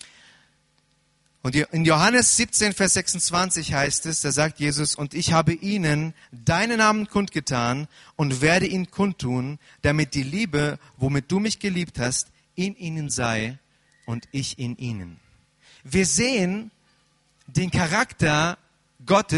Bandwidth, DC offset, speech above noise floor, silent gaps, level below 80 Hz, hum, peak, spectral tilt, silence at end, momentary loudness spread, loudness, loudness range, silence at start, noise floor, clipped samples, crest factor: 11.5 kHz; under 0.1%; 42 dB; none; -48 dBFS; none; -6 dBFS; -4 dB/octave; 0 s; 12 LU; -23 LUFS; 7 LU; 1.45 s; -65 dBFS; under 0.1%; 18 dB